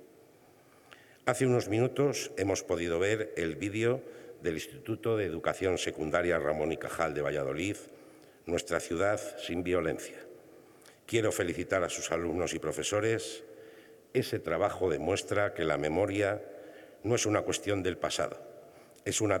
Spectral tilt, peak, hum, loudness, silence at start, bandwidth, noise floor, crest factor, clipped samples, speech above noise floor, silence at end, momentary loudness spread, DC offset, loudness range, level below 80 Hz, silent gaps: -4.5 dB/octave; -10 dBFS; none; -32 LUFS; 0 s; 19 kHz; -60 dBFS; 22 dB; under 0.1%; 29 dB; 0 s; 11 LU; under 0.1%; 3 LU; -62 dBFS; none